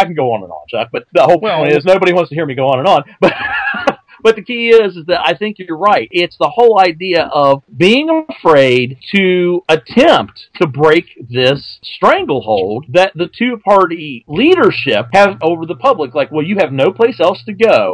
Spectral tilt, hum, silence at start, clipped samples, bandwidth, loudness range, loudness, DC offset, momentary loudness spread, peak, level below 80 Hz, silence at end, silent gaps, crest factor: -6 dB/octave; none; 0 s; 0.9%; 11 kHz; 2 LU; -12 LUFS; under 0.1%; 8 LU; 0 dBFS; -50 dBFS; 0 s; none; 12 dB